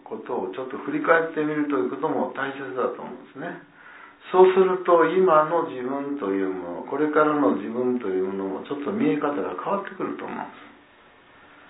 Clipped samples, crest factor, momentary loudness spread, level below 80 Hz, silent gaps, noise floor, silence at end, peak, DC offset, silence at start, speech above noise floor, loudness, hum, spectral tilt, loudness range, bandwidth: under 0.1%; 20 dB; 16 LU; -76 dBFS; none; -53 dBFS; 1 s; -4 dBFS; under 0.1%; 0.05 s; 30 dB; -23 LUFS; none; -10.5 dB/octave; 7 LU; 4 kHz